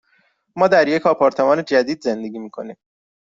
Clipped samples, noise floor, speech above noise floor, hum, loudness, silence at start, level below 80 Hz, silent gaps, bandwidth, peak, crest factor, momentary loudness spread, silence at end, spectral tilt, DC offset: under 0.1%; -62 dBFS; 44 dB; none; -17 LUFS; 0.55 s; -62 dBFS; none; 7.6 kHz; -2 dBFS; 16 dB; 18 LU; 0.45 s; -5.5 dB/octave; under 0.1%